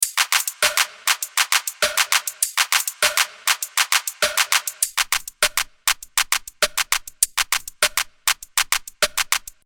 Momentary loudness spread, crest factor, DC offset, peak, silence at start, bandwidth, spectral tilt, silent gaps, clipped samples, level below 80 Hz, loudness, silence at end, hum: 4 LU; 22 dB; under 0.1%; 0 dBFS; 0 s; over 20 kHz; 3 dB/octave; none; under 0.1%; -52 dBFS; -20 LUFS; 0.25 s; none